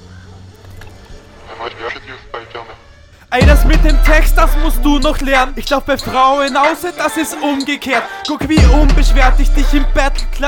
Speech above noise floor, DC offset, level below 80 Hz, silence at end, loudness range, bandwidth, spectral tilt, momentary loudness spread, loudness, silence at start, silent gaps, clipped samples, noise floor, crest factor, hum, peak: 31 dB; under 0.1%; -14 dBFS; 0 s; 5 LU; 17 kHz; -5 dB/octave; 17 LU; -13 LUFS; 0.05 s; none; 0.2%; -41 dBFS; 12 dB; none; 0 dBFS